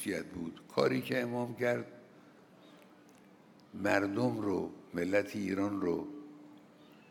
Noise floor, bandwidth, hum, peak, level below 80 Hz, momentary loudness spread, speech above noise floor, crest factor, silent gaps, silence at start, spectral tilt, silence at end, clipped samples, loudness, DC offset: -60 dBFS; 17.5 kHz; none; -14 dBFS; -76 dBFS; 16 LU; 26 dB; 22 dB; none; 0 s; -6 dB/octave; 0.1 s; under 0.1%; -34 LUFS; under 0.1%